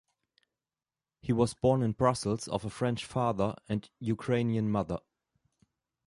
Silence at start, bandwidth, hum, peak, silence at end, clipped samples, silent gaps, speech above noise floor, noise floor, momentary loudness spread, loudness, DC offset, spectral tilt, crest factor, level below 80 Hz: 1.25 s; 11.5 kHz; none; -12 dBFS; 1.1 s; under 0.1%; none; over 60 dB; under -90 dBFS; 9 LU; -31 LUFS; under 0.1%; -6.5 dB/octave; 20 dB; -58 dBFS